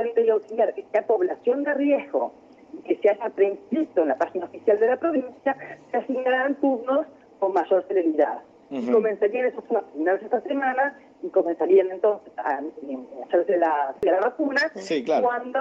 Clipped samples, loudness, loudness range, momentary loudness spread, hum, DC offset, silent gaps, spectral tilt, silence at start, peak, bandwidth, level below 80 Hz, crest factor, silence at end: under 0.1%; -24 LUFS; 1 LU; 8 LU; none; under 0.1%; none; -5.5 dB/octave; 0 s; -8 dBFS; 7.8 kHz; -72 dBFS; 16 dB; 0 s